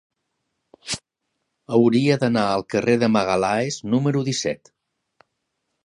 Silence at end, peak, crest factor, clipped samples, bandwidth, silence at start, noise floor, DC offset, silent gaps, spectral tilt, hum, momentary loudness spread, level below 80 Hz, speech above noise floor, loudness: 1.3 s; -4 dBFS; 18 dB; under 0.1%; 11.5 kHz; 0.85 s; -77 dBFS; under 0.1%; none; -5.5 dB/octave; none; 12 LU; -60 dBFS; 58 dB; -21 LUFS